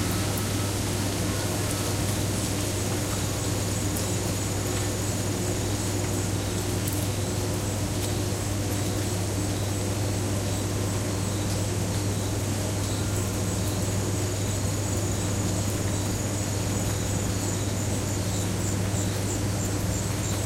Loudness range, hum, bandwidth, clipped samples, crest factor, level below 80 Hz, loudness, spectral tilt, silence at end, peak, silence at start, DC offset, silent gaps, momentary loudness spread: 1 LU; none; 16 kHz; under 0.1%; 16 dB; -40 dBFS; -27 LUFS; -4.5 dB/octave; 0 s; -12 dBFS; 0 s; under 0.1%; none; 1 LU